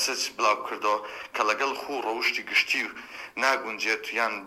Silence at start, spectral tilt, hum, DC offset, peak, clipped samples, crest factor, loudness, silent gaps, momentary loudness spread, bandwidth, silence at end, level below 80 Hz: 0 s; 0 dB/octave; none; under 0.1%; -8 dBFS; under 0.1%; 20 dB; -26 LUFS; none; 8 LU; 16 kHz; 0 s; -70 dBFS